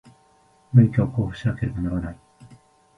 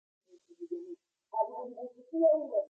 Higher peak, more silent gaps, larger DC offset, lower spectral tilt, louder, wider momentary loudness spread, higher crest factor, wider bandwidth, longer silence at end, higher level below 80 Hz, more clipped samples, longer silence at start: first, -2 dBFS vs -16 dBFS; neither; neither; about the same, -9.5 dB/octave vs -8.5 dB/octave; first, -22 LUFS vs -33 LUFS; second, 11 LU vs 22 LU; about the same, 20 dB vs 18 dB; first, 6 kHz vs 1.4 kHz; first, 0.85 s vs 0.05 s; first, -42 dBFS vs under -90 dBFS; neither; first, 0.75 s vs 0.6 s